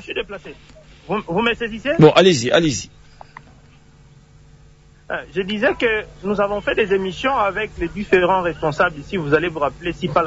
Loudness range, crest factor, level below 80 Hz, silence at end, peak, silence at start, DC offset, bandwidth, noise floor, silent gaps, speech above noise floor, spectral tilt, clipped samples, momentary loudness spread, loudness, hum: 7 LU; 20 dB; -44 dBFS; 0 s; 0 dBFS; 0 s; under 0.1%; 8 kHz; -48 dBFS; none; 30 dB; -5 dB/octave; under 0.1%; 13 LU; -18 LUFS; none